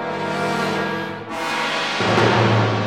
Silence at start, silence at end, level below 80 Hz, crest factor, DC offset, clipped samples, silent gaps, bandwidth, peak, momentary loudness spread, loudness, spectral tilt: 0 s; 0 s; -54 dBFS; 18 dB; 0.2%; under 0.1%; none; 14.5 kHz; -2 dBFS; 10 LU; -20 LUFS; -5.5 dB/octave